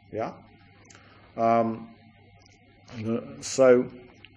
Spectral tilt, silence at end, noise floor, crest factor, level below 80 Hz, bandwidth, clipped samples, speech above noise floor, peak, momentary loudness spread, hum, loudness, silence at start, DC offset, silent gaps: -5.5 dB/octave; 0.35 s; -56 dBFS; 20 dB; -66 dBFS; 10.5 kHz; under 0.1%; 31 dB; -8 dBFS; 19 LU; none; -25 LUFS; 0.1 s; under 0.1%; none